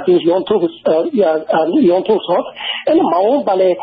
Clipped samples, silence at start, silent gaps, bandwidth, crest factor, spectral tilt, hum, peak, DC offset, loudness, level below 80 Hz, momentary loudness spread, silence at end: under 0.1%; 0 s; none; 5 kHz; 10 dB; -4 dB/octave; none; -2 dBFS; under 0.1%; -14 LUFS; -58 dBFS; 5 LU; 0 s